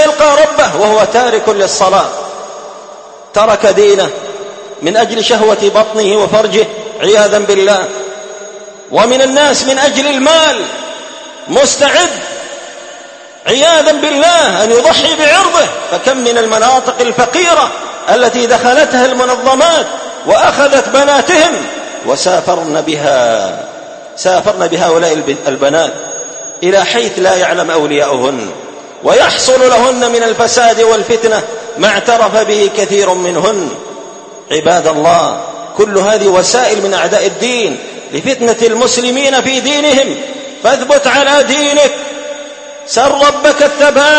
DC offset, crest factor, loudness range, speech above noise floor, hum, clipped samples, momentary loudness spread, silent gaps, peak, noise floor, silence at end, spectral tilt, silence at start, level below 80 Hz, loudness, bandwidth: under 0.1%; 10 dB; 3 LU; 22 dB; none; 0.3%; 15 LU; none; 0 dBFS; -31 dBFS; 0 s; -2 dB/octave; 0 s; -48 dBFS; -9 LUFS; 11 kHz